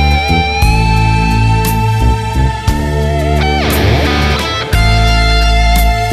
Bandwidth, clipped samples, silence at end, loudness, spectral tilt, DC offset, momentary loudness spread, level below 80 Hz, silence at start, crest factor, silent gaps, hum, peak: 14.5 kHz; under 0.1%; 0 s; -12 LUFS; -5.5 dB/octave; under 0.1%; 4 LU; -14 dBFS; 0 s; 10 dB; none; none; 0 dBFS